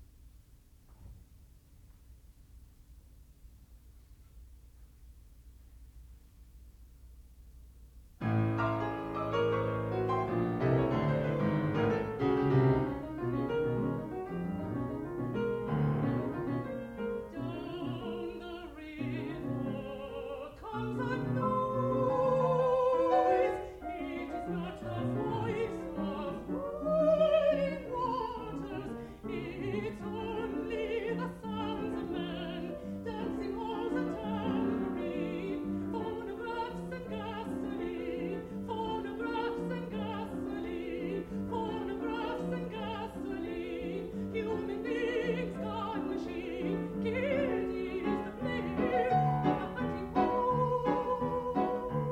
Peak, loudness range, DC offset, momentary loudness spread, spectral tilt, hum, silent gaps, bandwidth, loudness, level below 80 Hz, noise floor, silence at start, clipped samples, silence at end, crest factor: -16 dBFS; 7 LU; under 0.1%; 10 LU; -8.5 dB/octave; none; none; 16.5 kHz; -34 LUFS; -54 dBFS; -59 dBFS; 0 s; under 0.1%; 0 s; 18 dB